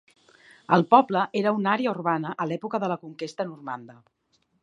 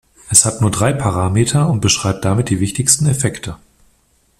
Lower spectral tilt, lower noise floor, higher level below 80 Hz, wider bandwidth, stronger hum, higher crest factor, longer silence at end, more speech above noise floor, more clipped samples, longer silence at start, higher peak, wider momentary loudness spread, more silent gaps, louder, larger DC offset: first, -7 dB/octave vs -4 dB/octave; about the same, -55 dBFS vs -57 dBFS; second, -76 dBFS vs -42 dBFS; second, 10.5 kHz vs 16 kHz; neither; first, 24 dB vs 16 dB; second, 0.7 s vs 0.85 s; second, 31 dB vs 42 dB; neither; first, 0.7 s vs 0.25 s; about the same, -2 dBFS vs 0 dBFS; first, 16 LU vs 7 LU; neither; second, -24 LUFS vs -14 LUFS; neither